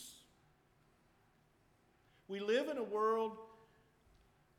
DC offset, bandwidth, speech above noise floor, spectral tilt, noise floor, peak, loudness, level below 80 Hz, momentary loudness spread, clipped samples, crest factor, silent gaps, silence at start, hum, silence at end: under 0.1%; 15.5 kHz; 35 dB; -4 dB/octave; -72 dBFS; -24 dBFS; -38 LUFS; -80 dBFS; 17 LU; under 0.1%; 18 dB; none; 0 s; none; 1.05 s